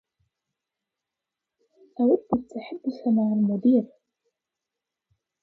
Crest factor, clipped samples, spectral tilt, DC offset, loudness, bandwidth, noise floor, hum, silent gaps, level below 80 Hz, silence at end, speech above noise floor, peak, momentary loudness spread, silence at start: 18 dB; under 0.1%; -10.5 dB/octave; under 0.1%; -24 LUFS; 5.6 kHz; -87 dBFS; none; none; -66 dBFS; 1.55 s; 64 dB; -10 dBFS; 14 LU; 2 s